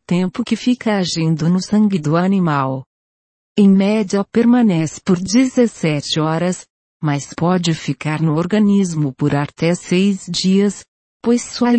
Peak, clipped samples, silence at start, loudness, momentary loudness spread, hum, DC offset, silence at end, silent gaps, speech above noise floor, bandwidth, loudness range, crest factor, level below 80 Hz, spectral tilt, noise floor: -2 dBFS; under 0.1%; 0.1 s; -17 LUFS; 7 LU; none; under 0.1%; 0 s; 2.86-3.55 s, 6.70-7.00 s, 10.88-11.20 s; over 74 dB; 8.8 kHz; 3 LU; 14 dB; -54 dBFS; -6 dB/octave; under -90 dBFS